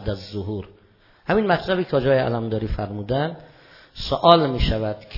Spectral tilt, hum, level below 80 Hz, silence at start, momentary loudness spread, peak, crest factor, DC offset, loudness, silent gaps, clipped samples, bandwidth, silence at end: -7.5 dB/octave; none; -36 dBFS; 0 s; 16 LU; 0 dBFS; 22 dB; under 0.1%; -21 LUFS; none; under 0.1%; 6 kHz; 0 s